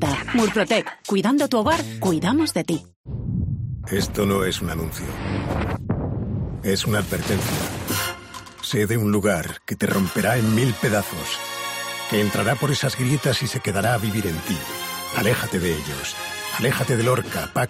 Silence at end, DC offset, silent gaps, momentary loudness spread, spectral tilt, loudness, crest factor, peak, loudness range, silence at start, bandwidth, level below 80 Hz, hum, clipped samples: 0 s; under 0.1%; 2.96-3.04 s; 8 LU; -5 dB/octave; -23 LUFS; 16 dB; -6 dBFS; 3 LU; 0 s; 16 kHz; -42 dBFS; none; under 0.1%